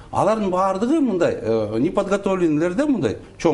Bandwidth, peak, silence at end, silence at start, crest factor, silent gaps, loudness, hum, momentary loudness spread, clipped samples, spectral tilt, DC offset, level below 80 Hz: 11.5 kHz; -4 dBFS; 0 s; 0 s; 16 dB; none; -20 LUFS; none; 3 LU; under 0.1%; -7 dB/octave; under 0.1%; -48 dBFS